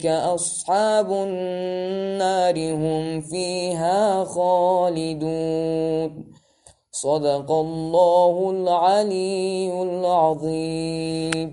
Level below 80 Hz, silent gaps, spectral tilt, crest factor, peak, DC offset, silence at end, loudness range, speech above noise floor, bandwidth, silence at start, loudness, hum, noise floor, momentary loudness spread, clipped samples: -58 dBFS; none; -5 dB/octave; 20 dB; -2 dBFS; under 0.1%; 0 s; 3 LU; 34 dB; 11.5 kHz; 0 s; -22 LUFS; none; -55 dBFS; 8 LU; under 0.1%